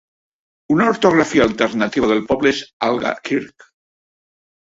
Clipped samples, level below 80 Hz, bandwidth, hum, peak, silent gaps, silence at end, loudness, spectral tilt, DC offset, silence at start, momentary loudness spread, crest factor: under 0.1%; -50 dBFS; 8 kHz; none; -2 dBFS; 2.73-2.80 s; 1.25 s; -17 LUFS; -5 dB/octave; under 0.1%; 0.7 s; 8 LU; 18 dB